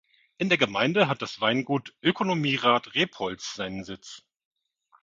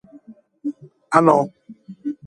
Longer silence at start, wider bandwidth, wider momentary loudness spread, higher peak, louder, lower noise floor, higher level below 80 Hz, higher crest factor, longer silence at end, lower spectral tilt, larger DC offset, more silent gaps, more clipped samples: about the same, 0.4 s vs 0.3 s; second, 7.8 kHz vs 11.5 kHz; second, 12 LU vs 17 LU; second, -4 dBFS vs 0 dBFS; second, -25 LUFS vs -19 LUFS; first, -65 dBFS vs -46 dBFS; about the same, -66 dBFS vs -66 dBFS; about the same, 24 dB vs 22 dB; first, 0.85 s vs 0.1 s; second, -5 dB/octave vs -7 dB/octave; neither; neither; neither